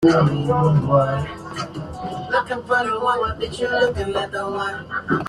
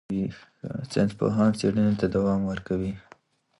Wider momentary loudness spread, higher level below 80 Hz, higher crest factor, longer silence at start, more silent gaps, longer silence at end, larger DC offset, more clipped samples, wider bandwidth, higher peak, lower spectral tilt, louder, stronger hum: about the same, 13 LU vs 13 LU; first, -44 dBFS vs -50 dBFS; about the same, 16 dB vs 16 dB; about the same, 0 s vs 0.1 s; neither; second, 0 s vs 0.6 s; neither; neither; about the same, 10.5 kHz vs 11.5 kHz; first, -4 dBFS vs -10 dBFS; about the same, -7 dB/octave vs -7.5 dB/octave; first, -21 LUFS vs -26 LUFS; neither